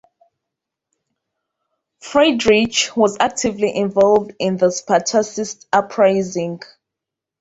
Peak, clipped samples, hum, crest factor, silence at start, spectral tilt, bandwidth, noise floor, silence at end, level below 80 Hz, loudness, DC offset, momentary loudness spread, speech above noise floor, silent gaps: -2 dBFS; under 0.1%; none; 18 dB; 2.05 s; -3.5 dB/octave; 8.2 kHz; -84 dBFS; 0.85 s; -56 dBFS; -17 LUFS; under 0.1%; 9 LU; 67 dB; none